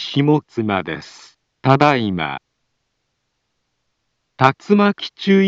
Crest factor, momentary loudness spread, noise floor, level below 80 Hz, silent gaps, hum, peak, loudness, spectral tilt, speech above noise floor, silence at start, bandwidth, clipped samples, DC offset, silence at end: 18 dB; 12 LU; -72 dBFS; -58 dBFS; none; none; 0 dBFS; -17 LUFS; -7 dB/octave; 56 dB; 0 s; 7.8 kHz; under 0.1%; under 0.1%; 0 s